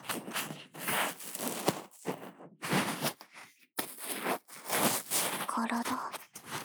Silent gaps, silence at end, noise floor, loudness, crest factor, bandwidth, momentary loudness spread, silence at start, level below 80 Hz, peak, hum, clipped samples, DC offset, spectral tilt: none; 0 s; -56 dBFS; -34 LUFS; 26 dB; over 20 kHz; 13 LU; 0 s; -82 dBFS; -10 dBFS; none; under 0.1%; under 0.1%; -2.5 dB/octave